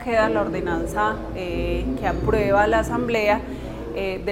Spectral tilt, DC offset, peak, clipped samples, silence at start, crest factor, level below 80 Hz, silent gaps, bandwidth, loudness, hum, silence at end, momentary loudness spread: -6 dB/octave; under 0.1%; -6 dBFS; under 0.1%; 0 s; 16 dB; -34 dBFS; none; 16 kHz; -23 LUFS; none; 0 s; 10 LU